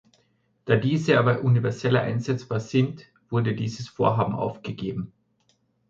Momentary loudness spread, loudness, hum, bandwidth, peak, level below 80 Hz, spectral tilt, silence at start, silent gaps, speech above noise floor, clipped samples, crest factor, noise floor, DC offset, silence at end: 12 LU; -25 LUFS; none; 7.6 kHz; -4 dBFS; -58 dBFS; -7.5 dB/octave; 0.65 s; none; 44 dB; under 0.1%; 20 dB; -68 dBFS; under 0.1%; 0.8 s